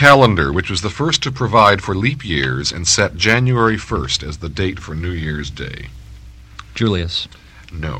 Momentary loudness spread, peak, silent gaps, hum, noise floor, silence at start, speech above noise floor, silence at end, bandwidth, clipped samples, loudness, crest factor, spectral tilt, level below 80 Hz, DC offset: 16 LU; 0 dBFS; none; none; -38 dBFS; 0 s; 21 dB; 0 s; 13.5 kHz; 0.1%; -16 LUFS; 16 dB; -4 dB/octave; -34 dBFS; under 0.1%